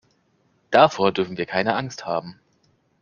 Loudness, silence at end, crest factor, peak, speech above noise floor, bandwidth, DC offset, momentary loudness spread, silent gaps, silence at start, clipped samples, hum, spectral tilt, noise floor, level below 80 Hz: -21 LUFS; 0.7 s; 22 dB; 0 dBFS; 44 dB; 7.2 kHz; under 0.1%; 12 LU; none; 0.7 s; under 0.1%; none; -5 dB/octave; -65 dBFS; -62 dBFS